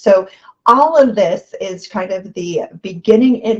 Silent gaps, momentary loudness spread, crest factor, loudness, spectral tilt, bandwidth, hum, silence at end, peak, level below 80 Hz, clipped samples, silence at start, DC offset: none; 15 LU; 14 dB; -14 LUFS; -6 dB/octave; 8 kHz; none; 0 s; 0 dBFS; -58 dBFS; under 0.1%; 0.05 s; under 0.1%